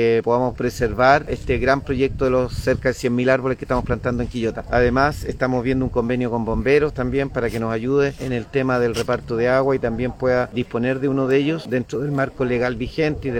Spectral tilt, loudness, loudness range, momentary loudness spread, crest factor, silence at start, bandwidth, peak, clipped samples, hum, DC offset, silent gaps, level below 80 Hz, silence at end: -7 dB/octave; -20 LUFS; 2 LU; 6 LU; 20 dB; 0 s; 16 kHz; 0 dBFS; under 0.1%; none; under 0.1%; none; -36 dBFS; 0 s